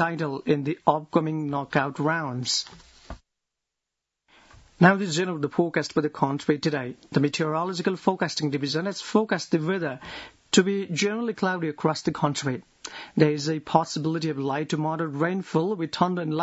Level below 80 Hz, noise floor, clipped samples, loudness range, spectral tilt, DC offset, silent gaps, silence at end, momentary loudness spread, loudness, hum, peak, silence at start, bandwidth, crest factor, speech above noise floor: -60 dBFS; -85 dBFS; under 0.1%; 2 LU; -5 dB/octave; under 0.1%; none; 0 s; 7 LU; -25 LUFS; none; -2 dBFS; 0 s; 8 kHz; 24 dB; 60 dB